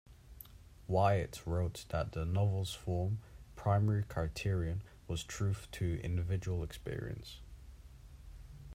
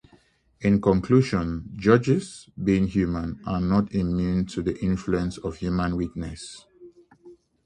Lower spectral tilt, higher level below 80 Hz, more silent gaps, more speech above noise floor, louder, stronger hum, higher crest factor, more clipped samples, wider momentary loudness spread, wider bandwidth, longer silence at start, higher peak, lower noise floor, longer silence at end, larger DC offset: about the same, -6.5 dB/octave vs -7.5 dB/octave; second, -52 dBFS vs -42 dBFS; neither; second, 20 dB vs 36 dB; second, -37 LUFS vs -24 LUFS; neither; about the same, 20 dB vs 22 dB; neither; first, 23 LU vs 11 LU; first, 15.5 kHz vs 10 kHz; second, 0.1 s vs 0.6 s; second, -16 dBFS vs -4 dBFS; second, -55 dBFS vs -60 dBFS; second, 0 s vs 0.3 s; neither